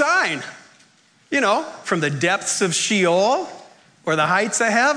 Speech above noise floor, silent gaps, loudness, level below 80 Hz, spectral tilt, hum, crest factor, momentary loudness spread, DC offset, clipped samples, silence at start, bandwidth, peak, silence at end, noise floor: 36 dB; none; -19 LUFS; -70 dBFS; -3 dB/octave; none; 14 dB; 8 LU; under 0.1%; under 0.1%; 0 s; 11 kHz; -6 dBFS; 0 s; -56 dBFS